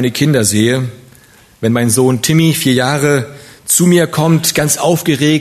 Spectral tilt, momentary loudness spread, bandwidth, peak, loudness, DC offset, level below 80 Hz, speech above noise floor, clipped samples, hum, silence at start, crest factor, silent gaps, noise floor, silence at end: -4.5 dB/octave; 7 LU; 14 kHz; 0 dBFS; -12 LUFS; under 0.1%; -48 dBFS; 32 dB; under 0.1%; none; 0 s; 12 dB; none; -44 dBFS; 0 s